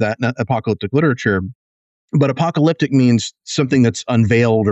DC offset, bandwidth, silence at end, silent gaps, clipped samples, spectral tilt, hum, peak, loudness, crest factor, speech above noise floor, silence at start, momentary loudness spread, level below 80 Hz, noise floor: under 0.1%; 8.4 kHz; 0 s; 1.55-2.08 s; under 0.1%; -6.5 dB/octave; none; -4 dBFS; -16 LUFS; 12 dB; over 75 dB; 0 s; 7 LU; -52 dBFS; under -90 dBFS